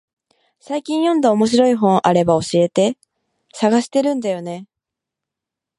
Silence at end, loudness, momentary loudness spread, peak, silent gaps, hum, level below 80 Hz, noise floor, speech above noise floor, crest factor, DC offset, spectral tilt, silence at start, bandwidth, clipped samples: 1.15 s; -17 LUFS; 12 LU; 0 dBFS; none; none; -58 dBFS; -85 dBFS; 69 dB; 18 dB; under 0.1%; -6 dB/octave; 0.7 s; 11.5 kHz; under 0.1%